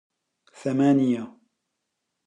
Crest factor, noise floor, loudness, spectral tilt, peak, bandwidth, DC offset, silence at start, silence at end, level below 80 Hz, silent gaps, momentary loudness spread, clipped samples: 16 dB; -80 dBFS; -23 LUFS; -8 dB/octave; -10 dBFS; 9.6 kHz; under 0.1%; 0.6 s; 0.95 s; -78 dBFS; none; 14 LU; under 0.1%